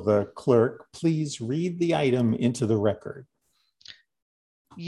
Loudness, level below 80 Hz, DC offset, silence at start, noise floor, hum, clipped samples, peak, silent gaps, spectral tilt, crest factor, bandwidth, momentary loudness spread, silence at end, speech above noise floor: -25 LUFS; -60 dBFS; under 0.1%; 0 s; -67 dBFS; none; under 0.1%; -8 dBFS; 4.22-4.65 s; -7 dB/octave; 18 dB; 11.5 kHz; 7 LU; 0 s; 42 dB